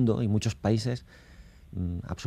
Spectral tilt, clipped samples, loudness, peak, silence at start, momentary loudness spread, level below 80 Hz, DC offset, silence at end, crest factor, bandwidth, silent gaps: -7 dB/octave; under 0.1%; -30 LUFS; -12 dBFS; 0 s; 10 LU; -52 dBFS; under 0.1%; 0 s; 18 dB; 11.5 kHz; none